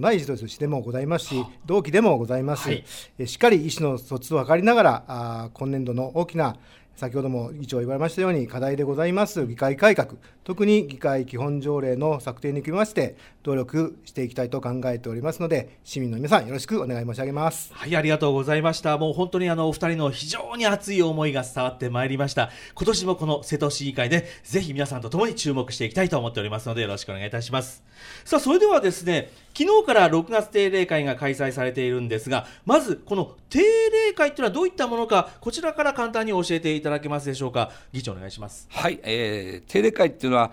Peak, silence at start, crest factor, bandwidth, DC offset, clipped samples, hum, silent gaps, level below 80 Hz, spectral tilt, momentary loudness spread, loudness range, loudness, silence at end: -2 dBFS; 0 s; 20 dB; 17 kHz; under 0.1%; under 0.1%; none; none; -54 dBFS; -5.5 dB/octave; 11 LU; 5 LU; -24 LUFS; 0 s